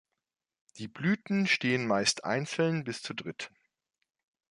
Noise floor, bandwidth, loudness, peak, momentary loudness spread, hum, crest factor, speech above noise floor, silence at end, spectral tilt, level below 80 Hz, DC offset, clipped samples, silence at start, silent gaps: -87 dBFS; 11.5 kHz; -30 LUFS; -12 dBFS; 16 LU; none; 20 dB; 57 dB; 1.05 s; -4 dB/octave; -72 dBFS; under 0.1%; under 0.1%; 0.75 s; none